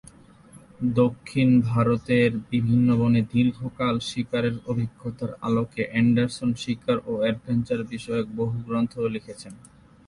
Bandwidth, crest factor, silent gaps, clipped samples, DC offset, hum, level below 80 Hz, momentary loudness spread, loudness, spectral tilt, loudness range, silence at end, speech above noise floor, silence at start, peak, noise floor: 11.5 kHz; 16 dB; none; under 0.1%; under 0.1%; none; -54 dBFS; 9 LU; -24 LUFS; -7.5 dB/octave; 5 LU; 0.4 s; 26 dB; 0.55 s; -8 dBFS; -50 dBFS